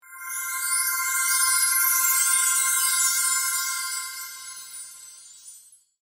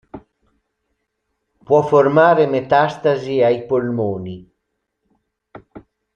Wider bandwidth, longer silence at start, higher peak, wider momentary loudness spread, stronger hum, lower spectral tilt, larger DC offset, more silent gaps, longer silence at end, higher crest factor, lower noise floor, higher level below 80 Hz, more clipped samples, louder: first, 16.5 kHz vs 7.2 kHz; about the same, 0.05 s vs 0.15 s; second, -8 dBFS vs -2 dBFS; first, 18 LU vs 12 LU; neither; second, 6.5 dB/octave vs -7.5 dB/octave; neither; neither; about the same, 0.45 s vs 0.35 s; about the same, 16 dB vs 18 dB; second, -51 dBFS vs -74 dBFS; second, -78 dBFS vs -58 dBFS; neither; second, -20 LUFS vs -16 LUFS